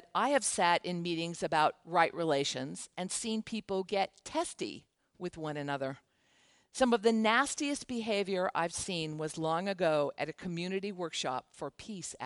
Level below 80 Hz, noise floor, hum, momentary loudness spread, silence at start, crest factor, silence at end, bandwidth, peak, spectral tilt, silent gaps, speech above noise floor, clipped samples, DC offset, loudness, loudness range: -68 dBFS; -69 dBFS; none; 13 LU; 0.15 s; 22 dB; 0 s; 11.5 kHz; -12 dBFS; -3.5 dB/octave; none; 36 dB; under 0.1%; under 0.1%; -33 LUFS; 6 LU